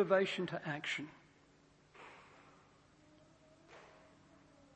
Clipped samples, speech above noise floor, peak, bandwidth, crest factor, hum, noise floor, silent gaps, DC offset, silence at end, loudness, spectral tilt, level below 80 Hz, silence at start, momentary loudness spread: under 0.1%; 31 dB; -18 dBFS; 8.4 kHz; 24 dB; none; -68 dBFS; none; under 0.1%; 0.9 s; -38 LUFS; -5 dB/octave; -80 dBFS; 0 s; 29 LU